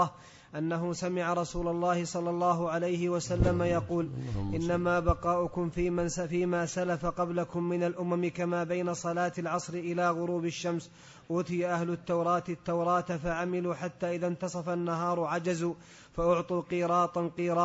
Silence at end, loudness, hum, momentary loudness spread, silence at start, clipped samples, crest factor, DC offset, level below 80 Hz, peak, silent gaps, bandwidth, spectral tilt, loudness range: 0 s; -31 LUFS; none; 6 LU; 0 s; under 0.1%; 20 dB; under 0.1%; -48 dBFS; -12 dBFS; none; 8 kHz; -6.5 dB/octave; 2 LU